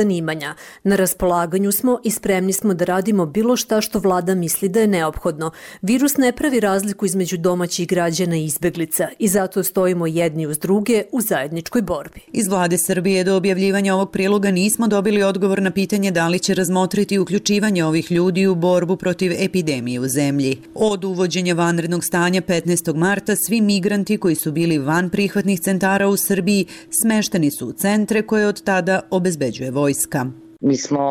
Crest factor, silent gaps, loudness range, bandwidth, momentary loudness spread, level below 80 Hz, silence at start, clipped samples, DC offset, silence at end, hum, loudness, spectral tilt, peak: 12 dB; none; 2 LU; 17 kHz; 5 LU; -50 dBFS; 0 s; under 0.1%; under 0.1%; 0 s; none; -18 LUFS; -5 dB/octave; -6 dBFS